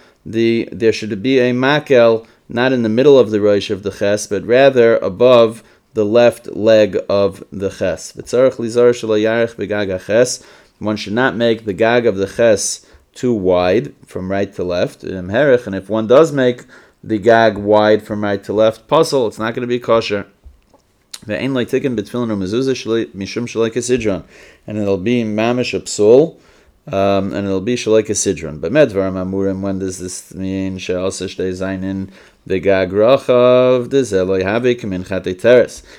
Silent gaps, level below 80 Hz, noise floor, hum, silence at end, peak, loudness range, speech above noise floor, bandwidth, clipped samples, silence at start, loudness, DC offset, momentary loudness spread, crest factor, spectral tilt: none; -52 dBFS; -54 dBFS; none; 0.2 s; 0 dBFS; 6 LU; 39 dB; 15 kHz; under 0.1%; 0.25 s; -15 LUFS; under 0.1%; 11 LU; 16 dB; -5 dB/octave